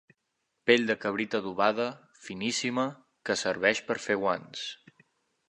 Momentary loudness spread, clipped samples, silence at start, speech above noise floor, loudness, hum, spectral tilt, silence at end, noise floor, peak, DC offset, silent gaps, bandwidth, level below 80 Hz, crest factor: 14 LU; under 0.1%; 0.65 s; 52 dB; -29 LUFS; none; -3.5 dB/octave; 0.75 s; -80 dBFS; -8 dBFS; under 0.1%; none; 11 kHz; -72 dBFS; 22 dB